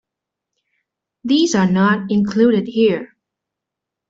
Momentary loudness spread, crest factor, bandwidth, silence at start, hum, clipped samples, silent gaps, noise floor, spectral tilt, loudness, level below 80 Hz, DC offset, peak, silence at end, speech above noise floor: 4 LU; 16 dB; 7.8 kHz; 1.25 s; none; under 0.1%; none; -83 dBFS; -5.5 dB/octave; -16 LUFS; -58 dBFS; under 0.1%; -4 dBFS; 1.05 s; 68 dB